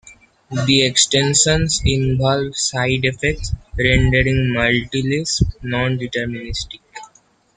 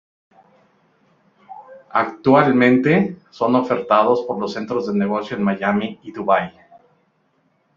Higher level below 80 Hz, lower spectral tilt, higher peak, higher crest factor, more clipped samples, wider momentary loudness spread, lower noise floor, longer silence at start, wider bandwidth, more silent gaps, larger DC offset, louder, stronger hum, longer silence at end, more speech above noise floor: first, -32 dBFS vs -60 dBFS; second, -3.5 dB/octave vs -8 dB/octave; about the same, 0 dBFS vs -2 dBFS; about the same, 18 dB vs 18 dB; neither; about the same, 13 LU vs 11 LU; second, -54 dBFS vs -63 dBFS; second, 0.05 s vs 1.5 s; first, 9.6 kHz vs 7.2 kHz; neither; neither; about the same, -17 LUFS vs -18 LUFS; neither; second, 0.5 s vs 1.25 s; second, 37 dB vs 46 dB